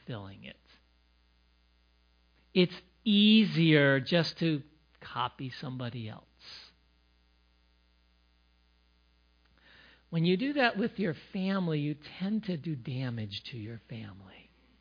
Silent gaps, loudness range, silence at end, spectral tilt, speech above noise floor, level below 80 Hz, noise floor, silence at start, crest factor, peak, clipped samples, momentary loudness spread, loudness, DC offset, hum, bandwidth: none; 14 LU; 0.5 s; -7.5 dB/octave; 38 dB; -68 dBFS; -67 dBFS; 0.1 s; 22 dB; -10 dBFS; under 0.1%; 24 LU; -30 LUFS; under 0.1%; none; 5.2 kHz